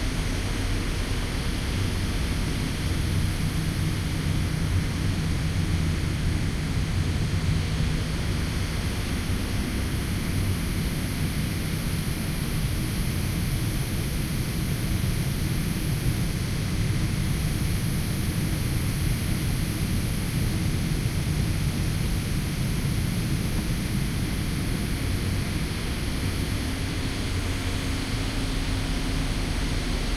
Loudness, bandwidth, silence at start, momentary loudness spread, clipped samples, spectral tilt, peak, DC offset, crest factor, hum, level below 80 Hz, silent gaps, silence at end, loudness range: -27 LUFS; 15.5 kHz; 0 s; 2 LU; under 0.1%; -5 dB/octave; -12 dBFS; under 0.1%; 14 dB; none; -32 dBFS; none; 0 s; 2 LU